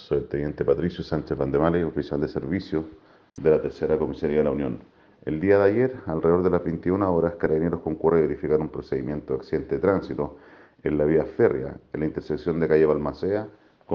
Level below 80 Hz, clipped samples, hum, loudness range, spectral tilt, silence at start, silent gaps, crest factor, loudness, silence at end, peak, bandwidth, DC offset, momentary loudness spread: -48 dBFS; under 0.1%; none; 3 LU; -9.5 dB/octave; 0 s; none; 18 dB; -24 LUFS; 0 s; -6 dBFS; 6.4 kHz; under 0.1%; 10 LU